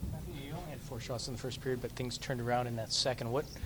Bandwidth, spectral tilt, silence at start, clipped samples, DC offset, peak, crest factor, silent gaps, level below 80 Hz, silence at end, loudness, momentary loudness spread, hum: over 20 kHz; -4.5 dB/octave; 0 s; under 0.1%; under 0.1%; -18 dBFS; 20 dB; none; -52 dBFS; 0 s; -37 LUFS; 11 LU; none